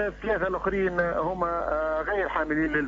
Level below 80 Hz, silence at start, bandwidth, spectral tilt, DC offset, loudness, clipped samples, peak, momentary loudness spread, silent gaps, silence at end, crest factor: -44 dBFS; 0 s; 7.6 kHz; -7.5 dB/octave; under 0.1%; -27 LUFS; under 0.1%; -12 dBFS; 2 LU; none; 0 s; 14 dB